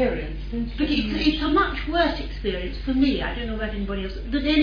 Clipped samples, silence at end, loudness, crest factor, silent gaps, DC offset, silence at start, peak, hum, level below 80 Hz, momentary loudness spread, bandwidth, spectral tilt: under 0.1%; 0 s; -25 LUFS; 16 dB; none; under 0.1%; 0 s; -8 dBFS; none; -32 dBFS; 9 LU; 5.2 kHz; -7 dB/octave